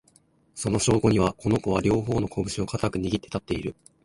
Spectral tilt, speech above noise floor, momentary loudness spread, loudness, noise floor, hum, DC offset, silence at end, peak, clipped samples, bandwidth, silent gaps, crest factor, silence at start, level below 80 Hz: -5.5 dB/octave; 37 dB; 10 LU; -25 LUFS; -61 dBFS; none; under 0.1%; 0.35 s; -8 dBFS; under 0.1%; 11.5 kHz; none; 18 dB; 0.55 s; -44 dBFS